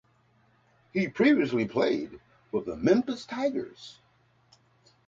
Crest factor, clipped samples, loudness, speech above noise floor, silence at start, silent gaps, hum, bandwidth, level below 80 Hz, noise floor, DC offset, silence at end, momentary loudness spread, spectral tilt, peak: 20 dB; under 0.1%; -27 LUFS; 39 dB; 0.95 s; none; none; 7.8 kHz; -64 dBFS; -65 dBFS; under 0.1%; 1.15 s; 18 LU; -6.5 dB/octave; -10 dBFS